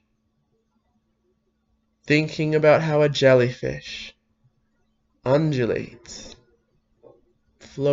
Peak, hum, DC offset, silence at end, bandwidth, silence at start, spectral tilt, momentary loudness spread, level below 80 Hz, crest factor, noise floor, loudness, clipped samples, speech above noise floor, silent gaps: -4 dBFS; none; under 0.1%; 0 s; 7.8 kHz; 2.05 s; -6.5 dB/octave; 22 LU; -56 dBFS; 20 dB; -70 dBFS; -21 LUFS; under 0.1%; 50 dB; none